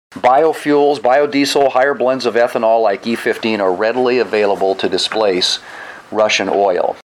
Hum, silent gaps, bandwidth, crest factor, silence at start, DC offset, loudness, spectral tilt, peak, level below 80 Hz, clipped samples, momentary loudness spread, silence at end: none; none; 15 kHz; 12 dB; 0.15 s; under 0.1%; -14 LUFS; -3.5 dB/octave; -2 dBFS; -64 dBFS; under 0.1%; 4 LU; 0.1 s